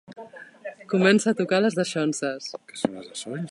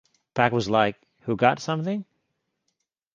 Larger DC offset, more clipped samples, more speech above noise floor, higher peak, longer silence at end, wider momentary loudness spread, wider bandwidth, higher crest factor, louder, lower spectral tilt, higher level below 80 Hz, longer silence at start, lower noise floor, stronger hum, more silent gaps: neither; neither; second, 19 dB vs 55 dB; about the same, -6 dBFS vs -4 dBFS; second, 0 s vs 1.1 s; first, 21 LU vs 11 LU; first, 11.5 kHz vs 7.6 kHz; about the same, 20 dB vs 22 dB; about the same, -24 LUFS vs -24 LUFS; about the same, -5 dB/octave vs -6 dB/octave; second, -70 dBFS vs -60 dBFS; second, 0.1 s vs 0.35 s; second, -43 dBFS vs -78 dBFS; neither; neither